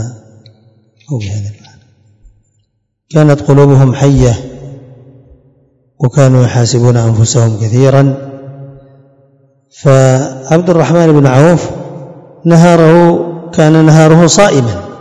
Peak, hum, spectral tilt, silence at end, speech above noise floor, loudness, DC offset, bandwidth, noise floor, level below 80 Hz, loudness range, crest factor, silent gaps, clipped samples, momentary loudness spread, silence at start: 0 dBFS; none; -6.5 dB/octave; 0.05 s; 55 dB; -8 LUFS; under 0.1%; 11 kHz; -61 dBFS; -36 dBFS; 5 LU; 10 dB; none; 5%; 17 LU; 0 s